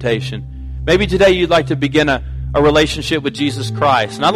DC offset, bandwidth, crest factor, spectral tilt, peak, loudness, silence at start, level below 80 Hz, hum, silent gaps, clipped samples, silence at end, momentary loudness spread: under 0.1%; 14.5 kHz; 12 dB; -5.5 dB/octave; -2 dBFS; -15 LUFS; 0 s; -30 dBFS; none; none; under 0.1%; 0 s; 9 LU